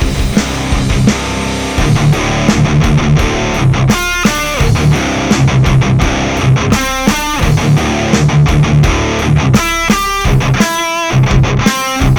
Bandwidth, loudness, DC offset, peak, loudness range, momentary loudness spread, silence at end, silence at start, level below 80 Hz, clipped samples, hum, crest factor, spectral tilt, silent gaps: 19.5 kHz; -11 LUFS; under 0.1%; 0 dBFS; 1 LU; 4 LU; 0 s; 0 s; -20 dBFS; 0.4%; none; 10 dB; -5 dB/octave; none